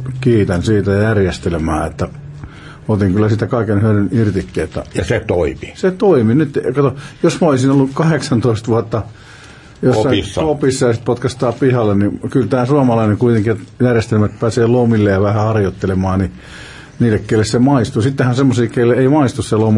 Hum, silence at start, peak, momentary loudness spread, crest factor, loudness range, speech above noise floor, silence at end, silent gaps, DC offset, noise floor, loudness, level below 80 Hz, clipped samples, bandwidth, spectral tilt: none; 0 s; -2 dBFS; 9 LU; 12 dB; 3 LU; 24 dB; 0 s; none; under 0.1%; -38 dBFS; -15 LUFS; -40 dBFS; under 0.1%; 11.5 kHz; -7 dB/octave